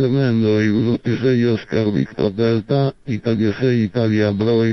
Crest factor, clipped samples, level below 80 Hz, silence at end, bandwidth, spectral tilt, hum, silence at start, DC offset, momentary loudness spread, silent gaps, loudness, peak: 12 dB; under 0.1%; -46 dBFS; 0 s; 6.2 kHz; -8.5 dB/octave; none; 0 s; under 0.1%; 4 LU; none; -18 LUFS; -4 dBFS